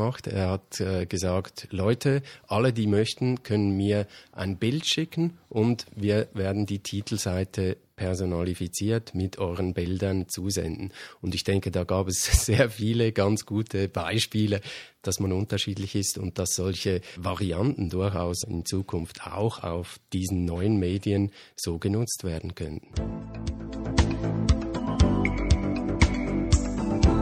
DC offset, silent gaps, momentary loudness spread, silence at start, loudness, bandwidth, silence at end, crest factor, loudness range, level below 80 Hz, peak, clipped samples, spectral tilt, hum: under 0.1%; none; 9 LU; 0 s; -27 LUFS; 16 kHz; 0 s; 22 dB; 4 LU; -36 dBFS; -4 dBFS; under 0.1%; -5.5 dB/octave; none